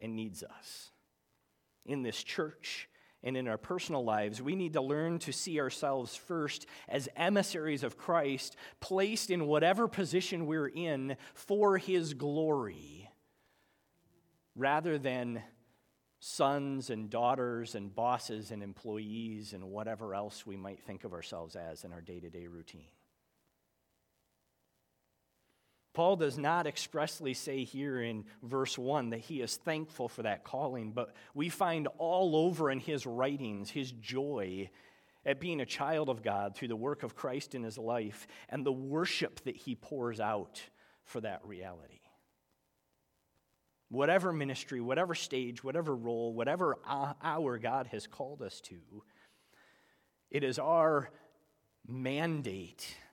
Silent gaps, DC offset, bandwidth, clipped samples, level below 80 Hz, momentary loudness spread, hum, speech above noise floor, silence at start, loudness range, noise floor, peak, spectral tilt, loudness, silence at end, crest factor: none; under 0.1%; 18 kHz; under 0.1%; -76 dBFS; 15 LU; none; 44 dB; 0 s; 10 LU; -80 dBFS; -14 dBFS; -5 dB/octave; -36 LUFS; 0.05 s; 22 dB